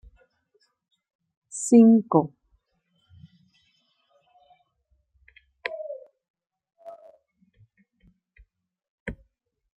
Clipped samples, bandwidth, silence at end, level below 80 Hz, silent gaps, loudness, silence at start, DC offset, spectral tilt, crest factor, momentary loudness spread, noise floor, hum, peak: under 0.1%; 11 kHz; 0.65 s; -60 dBFS; 6.30-6.34 s, 8.88-9.06 s; -21 LUFS; 1.55 s; under 0.1%; -6.5 dB/octave; 24 dB; 29 LU; -72 dBFS; none; -4 dBFS